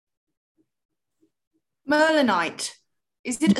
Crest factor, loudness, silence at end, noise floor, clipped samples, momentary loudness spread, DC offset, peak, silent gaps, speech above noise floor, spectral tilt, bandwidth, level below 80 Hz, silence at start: 20 dB; -23 LUFS; 0 s; -70 dBFS; under 0.1%; 17 LU; under 0.1%; -6 dBFS; 3.19-3.24 s; 49 dB; -4 dB/octave; 12.5 kHz; -66 dBFS; 1.85 s